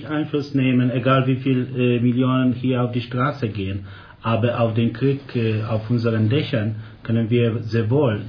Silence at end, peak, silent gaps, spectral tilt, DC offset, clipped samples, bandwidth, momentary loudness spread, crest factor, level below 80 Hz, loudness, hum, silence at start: 0 s; -4 dBFS; none; -9.5 dB/octave; under 0.1%; under 0.1%; 5.4 kHz; 7 LU; 16 dB; -54 dBFS; -21 LUFS; none; 0 s